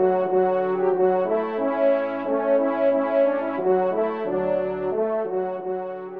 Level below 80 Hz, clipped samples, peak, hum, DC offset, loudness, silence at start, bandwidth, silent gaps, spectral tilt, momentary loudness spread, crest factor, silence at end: -64 dBFS; under 0.1%; -10 dBFS; none; 0.2%; -23 LUFS; 0 s; 4.5 kHz; none; -9.5 dB/octave; 5 LU; 12 dB; 0 s